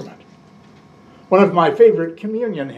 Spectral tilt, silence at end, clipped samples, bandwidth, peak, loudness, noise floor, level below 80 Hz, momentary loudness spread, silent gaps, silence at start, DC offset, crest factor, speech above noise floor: -8 dB/octave; 0 s; under 0.1%; 7.2 kHz; 0 dBFS; -15 LUFS; -46 dBFS; -68 dBFS; 11 LU; none; 0 s; under 0.1%; 16 dB; 31 dB